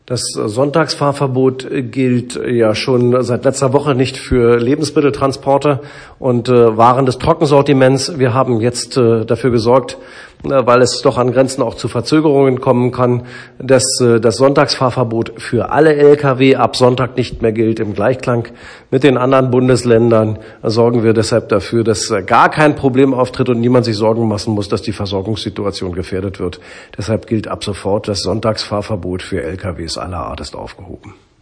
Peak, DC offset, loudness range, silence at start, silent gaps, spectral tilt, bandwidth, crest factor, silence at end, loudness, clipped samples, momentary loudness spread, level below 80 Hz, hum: 0 dBFS; under 0.1%; 7 LU; 0.1 s; none; -6 dB/octave; 10.5 kHz; 14 dB; 0.3 s; -13 LUFS; 0.3%; 11 LU; -40 dBFS; none